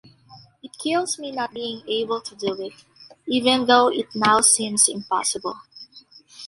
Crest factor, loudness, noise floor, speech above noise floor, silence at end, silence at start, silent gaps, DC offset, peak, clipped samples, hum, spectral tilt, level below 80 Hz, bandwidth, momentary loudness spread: 22 dB; -20 LUFS; -50 dBFS; 28 dB; 0 s; 0.3 s; none; under 0.1%; -2 dBFS; under 0.1%; none; -1.5 dB/octave; -64 dBFS; 12 kHz; 15 LU